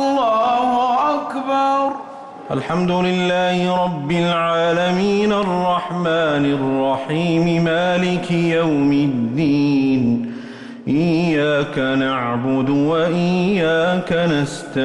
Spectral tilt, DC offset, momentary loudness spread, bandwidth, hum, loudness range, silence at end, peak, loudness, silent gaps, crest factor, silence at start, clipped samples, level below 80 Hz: -6.5 dB/octave; under 0.1%; 5 LU; 11 kHz; none; 1 LU; 0 s; -8 dBFS; -18 LUFS; none; 10 dB; 0 s; under 0.1%; -52 dBFS